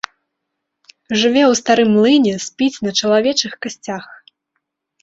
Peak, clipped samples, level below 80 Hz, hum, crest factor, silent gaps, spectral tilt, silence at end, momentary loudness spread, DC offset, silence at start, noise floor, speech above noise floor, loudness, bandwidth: 0 dBFS; under 0.1%; -60 dBFS; none; 16 dB; none; -3.5 dB/octave; 0.9 s; 15 LU; under 0.1%; 1.1 s; -76 dBFS; 61 dB; -15 LUFS; 8 kHz